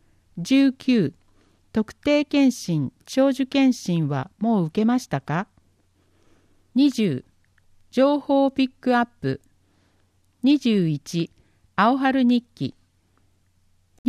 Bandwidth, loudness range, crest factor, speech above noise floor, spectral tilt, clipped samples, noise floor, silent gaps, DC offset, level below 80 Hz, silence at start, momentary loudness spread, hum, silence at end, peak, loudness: 13 kHz; 3 LU; 16 dB; 42 dB; -6.5 dB/octave; under 0.1%; -63 dBFS; 13.99-14.04 s; under 0.1%; -60 dBFS; 0.35 s; 10 LU; none; 0 s; -6 dBFS; -22 LUFS